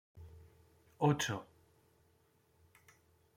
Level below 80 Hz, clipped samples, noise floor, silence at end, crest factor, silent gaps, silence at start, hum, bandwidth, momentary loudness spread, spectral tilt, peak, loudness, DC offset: -70 dBFS; under 0.1%; -72 dBFS; 1.95 s; 22 dB; none; 0.15 s; none; 16 kHz; 25 LU; -5 dB/octave; -20 dBFS; -35 LUFS; under 0.1%